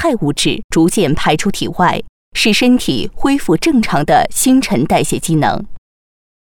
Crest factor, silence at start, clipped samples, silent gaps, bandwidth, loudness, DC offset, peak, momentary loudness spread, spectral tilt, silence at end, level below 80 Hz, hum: 12 dB; 0 s; under 0.1%; 0.64-0.69 s, 2.09-2.32 s; 18 kHz; -14 LUFS; under 0.1%; -2 dBFS; 6 LU; -4.5 dB/octave; 0.75 s; -34 dBFS; none